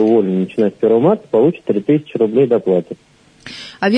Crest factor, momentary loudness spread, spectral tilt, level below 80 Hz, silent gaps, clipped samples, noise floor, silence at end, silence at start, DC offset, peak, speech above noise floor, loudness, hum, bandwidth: 12 dB; 18 LU; -8 dB/octave; -62 dBFS; none; under 0.1%; -37 dBFS; 0 s; 0 s; under 0.1%; -2 dBFS; 23 dB; -15 LUFS; none; 8.8 kHz